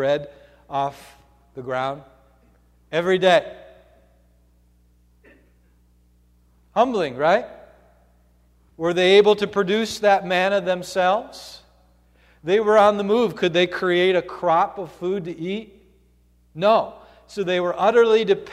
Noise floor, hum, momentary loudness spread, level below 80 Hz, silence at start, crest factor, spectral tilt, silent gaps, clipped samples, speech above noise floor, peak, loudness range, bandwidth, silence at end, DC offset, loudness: -58 dBFS; 60 Hz at -55 dBFS; 17 LU; -58 dBFS; 0 s; 18 dB; -5 dB/octave; none; under 0.1%; 38 dB; -4 dBFS; 6 LU; 13.5 kHz; 0 s; under 0.1%; -20 LUFS